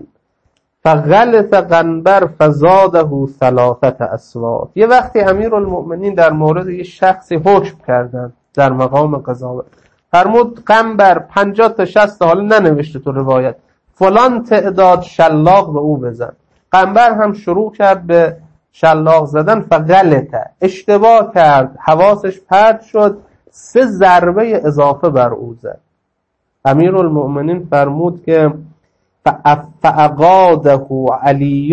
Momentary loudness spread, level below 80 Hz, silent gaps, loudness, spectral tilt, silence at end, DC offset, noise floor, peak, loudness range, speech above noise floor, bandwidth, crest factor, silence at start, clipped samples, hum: 10 LU; -46 dBFS; none; -11 LUFS; -7.5 dB/octave; 0 s; under 0.1%; -68 dBFS; 0 dBFS; 4 LU; 58 dB; 8.6 kHz; 10 dB; 0.85 s; 0.1%; none